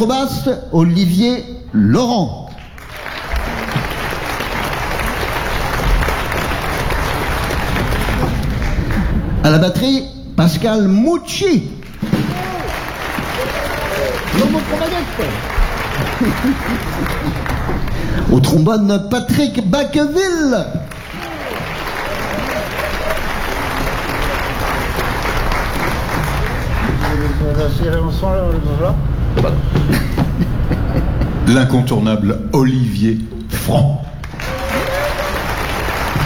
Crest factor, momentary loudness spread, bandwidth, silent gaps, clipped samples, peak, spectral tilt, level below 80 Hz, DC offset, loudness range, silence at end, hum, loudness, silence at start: 14 dB; 9 LU; over 20 kHz; none; under 0.1%; -2 dBFS; -6 dB/octave; -24 dBFS; under 0.1%; 4 LU; 0 s; none; -17 LUFS; 0 s